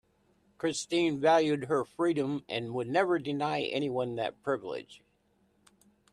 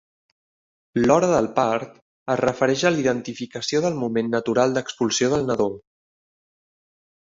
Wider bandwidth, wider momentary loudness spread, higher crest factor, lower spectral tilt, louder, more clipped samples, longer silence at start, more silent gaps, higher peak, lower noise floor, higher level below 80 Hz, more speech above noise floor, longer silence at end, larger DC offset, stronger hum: first, 11.5 kHz vs 7.8 kHz; about the same, 9 LU vs 10 LU; about the same, 18 dB vs 20 dB; about the same, -5 dB/octave vs -4.5 dB/octave; second, -30 LUFS vs -22 LUFS; neither; second, 0.65 s vs 0.95 s; second, none vs 2.02-2.26 s; second, -12 dBFS vs -4 dBFS; second, -71 dBFS vs under -90 dBFS; second, -72 dBFS vs -56 dBFS; second, 41 dB vs over 69 dB; second, 1.15 s vs 1.6 s; neither; neither